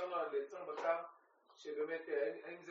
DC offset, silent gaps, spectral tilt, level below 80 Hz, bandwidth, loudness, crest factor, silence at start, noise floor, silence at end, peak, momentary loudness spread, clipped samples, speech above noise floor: under 0.1%; none; -2 dB/octave; under -90 dBFS; 7.4 kHz; -42 LUFS; 18 dB; 0 s; -68 dBFS; 0 s; -24 dBFS; 11 LU; under 0.1%; 26 dB